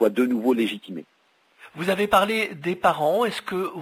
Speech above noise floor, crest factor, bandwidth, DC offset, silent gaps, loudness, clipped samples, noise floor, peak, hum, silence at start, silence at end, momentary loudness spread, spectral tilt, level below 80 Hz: 30 dB; 18 dB; 16 kHz; under 0.1%; none; -23 LUFS; under 0.1%; -53 dBFS; -4 dBFS; none; 0 s; 0 s; 15 LU; -5 dB/octave; -60 dBFS